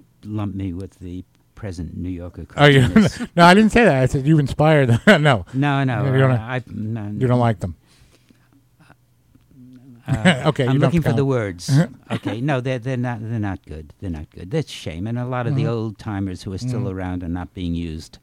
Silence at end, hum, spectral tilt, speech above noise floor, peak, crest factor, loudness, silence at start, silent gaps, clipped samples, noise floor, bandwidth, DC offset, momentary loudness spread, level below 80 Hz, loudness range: 0.15 s; none; -6.5 dB/octave; 37 dB; 0 dBFS; 20 dB; -19 LUFS; 0.25 s; none; under 0.1%; -56 dBFS; 13.5 kHz; under 0.1%; 18 LU; -42 dBFS; 11 LU